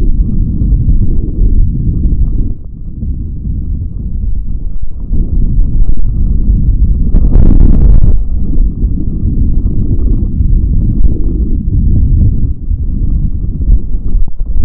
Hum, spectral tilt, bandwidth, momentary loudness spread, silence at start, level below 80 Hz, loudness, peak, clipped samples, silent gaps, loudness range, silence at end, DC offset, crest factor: none; -14 dB/octave; 1.3 kHz; 10 LU; 0 s; -10 dBFS; -14 LUFS; 0 dBFS; 2%; none; 6 LU; 0 s; under 0.1%; 8 dB